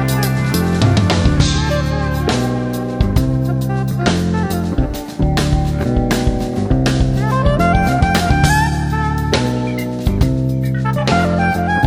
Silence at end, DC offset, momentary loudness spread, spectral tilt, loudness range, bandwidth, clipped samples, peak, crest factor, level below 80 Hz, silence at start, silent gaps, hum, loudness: 0 s; under 0.1%; 5 LU; -6 dB/octave; 2 LU; 16.5 kHz; under 0.1%; 0 dBFS; 14 dB; -22 dBFS; 0 s; none; none; -16 LUFS